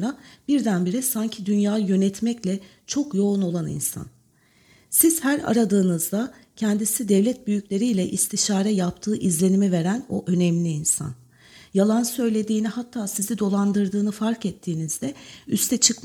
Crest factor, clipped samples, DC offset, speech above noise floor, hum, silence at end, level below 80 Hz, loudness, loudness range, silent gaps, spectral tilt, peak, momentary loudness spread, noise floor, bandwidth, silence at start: 20 dB; under 0.1%; under 0.1%; 37 dB; none; 0.05 s; -60 dBFS; -23 LUFS; 3 LU; none; -4.5 dB/octave; -2 dBFS; 9 LU; -59 dBFS; 18.5 kHz; 0 s